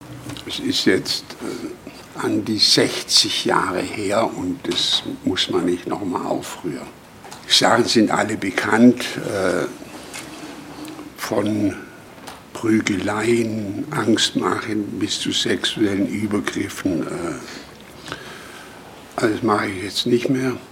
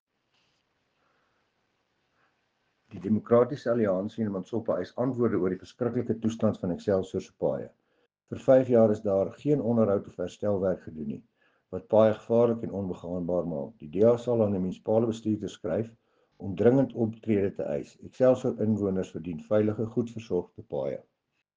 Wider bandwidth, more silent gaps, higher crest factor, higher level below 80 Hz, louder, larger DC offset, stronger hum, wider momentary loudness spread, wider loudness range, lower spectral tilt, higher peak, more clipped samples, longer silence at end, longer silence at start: first, 16.5 kHz vs 7.6 kHz; neither; about the same, 20 dB vs 20 dB; first, -56 dBFS vs -64 dBFS; first, -20 LUFS vs -28 LUFS; neither; neither; first, 20 LU vs 14 LU; first, 7 LU vs 4 LU; second, -3.5 dB/octave vs -8.5 dB/octave; first, 0 dBFS vs -8 dBFS; neither; second, 0 s vs 0.6 s; second, 0 s vs 2.9 s